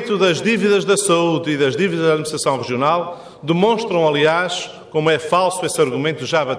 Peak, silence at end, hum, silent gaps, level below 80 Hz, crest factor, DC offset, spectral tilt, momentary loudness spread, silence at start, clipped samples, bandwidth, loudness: -4 dBFS; 0 s; none; none; -60 dBFS; 14 dB; under 0.1%; -4.5 dB/octave; 6 LU; 0 s; under 0.1%; 11 kHz; -17 LUFS